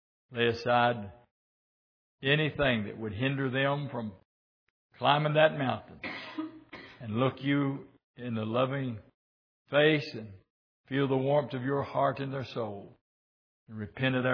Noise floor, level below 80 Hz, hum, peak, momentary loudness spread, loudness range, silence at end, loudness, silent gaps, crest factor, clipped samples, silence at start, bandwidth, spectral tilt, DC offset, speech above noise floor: -50 dBFS; -64 dBFS; none; -8 dBFS; 17 LU; 3 LU; 0 s; -30 LUFS; 1.31-2.18 s, 4.25-4.90 s, 8.04-8.14 s, 9.14-9.65 s, 10.50-10.84 s, 13.01-13.66 s; 22 dB; under 0.1%; 0.3 s; 5.4 kHz; -7.5 dB/octave; under 0.1%; 20 dB